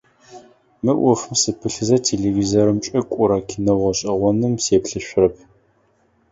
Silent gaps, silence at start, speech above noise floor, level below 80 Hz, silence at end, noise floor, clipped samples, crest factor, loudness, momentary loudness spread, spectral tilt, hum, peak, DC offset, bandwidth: none; 0.3 s; 42 dB; -46 dBFS; 0.95 s; -60 dBFS; under 0.1%; 18 dB; -19 LUFS; 4 LU; -5 dB/octave; none; -2 dBFS; under 0.1%; 8 kHz